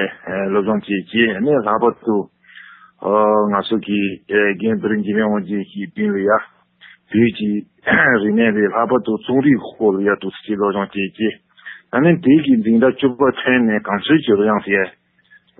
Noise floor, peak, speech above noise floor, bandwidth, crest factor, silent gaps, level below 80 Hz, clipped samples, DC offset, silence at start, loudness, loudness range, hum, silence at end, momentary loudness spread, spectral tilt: -53 dBFS; -2 dBFS; 36 dB; 4.1 kHz; 16 dB; none; -54 dBFS; under 0.1%; under 0.1%; 0 s; -17 LUFS; 4 LU; none; 0.7 s; 9 LU; -11.5 dB/octave